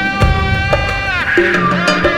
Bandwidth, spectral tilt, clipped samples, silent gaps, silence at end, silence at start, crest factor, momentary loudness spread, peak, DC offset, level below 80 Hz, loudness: 14.5 kHz; -5.5 dB/octave; under 0.1%; none; 0 s; 0 s; 12 dB; 3 LU; 0 dBFS; under 0.1%; -22 dBFS; -13 LUFS